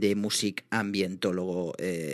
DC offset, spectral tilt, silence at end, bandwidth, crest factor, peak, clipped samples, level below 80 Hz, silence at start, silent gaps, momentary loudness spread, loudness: under 0.1%; -4 dB/octave; 0 s; 13.5 kHz; 16 dB; -12 dBFS; under 0.1%; -72 dBFS; 0 s; none; 5 LU; -29 LUFS